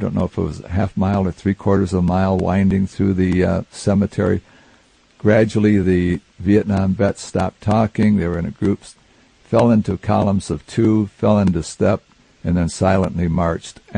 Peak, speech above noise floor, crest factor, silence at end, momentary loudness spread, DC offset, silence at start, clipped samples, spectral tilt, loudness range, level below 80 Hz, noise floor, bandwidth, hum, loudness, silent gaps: -2 dBFS; 36 dB; 16 dB; 0 s; 7 LU; under 0.1%; 0 s; under 0.1%; -7.5 dB/octave; 1 LU; -44 dBFS; -53 dBFS; 10 kHz; none; -18 LUFS; none